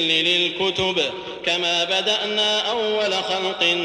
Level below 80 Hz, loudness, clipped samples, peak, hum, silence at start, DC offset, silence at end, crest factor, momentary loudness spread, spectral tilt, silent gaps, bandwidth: -58 dBFS; -20 LUFS; under 0.1%; -6 dBFS; none; 0 s; under 0.1%; 0 s; 14 dB; 5 LU; -2.5 dB/octave; none; 13 kHz